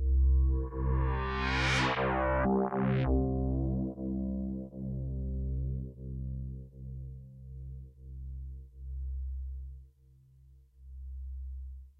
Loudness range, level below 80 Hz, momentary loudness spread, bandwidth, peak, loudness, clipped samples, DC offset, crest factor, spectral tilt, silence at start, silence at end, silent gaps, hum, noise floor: 15 LU; -36 dBFS; 19 LU; 8.2 kHz; -18 dBFS; -33 LUFS; under 0.1%; under 0.1%; 16 dB; -7 dB/octave; 0 s; 0.1 s; none; none; -61 dBFS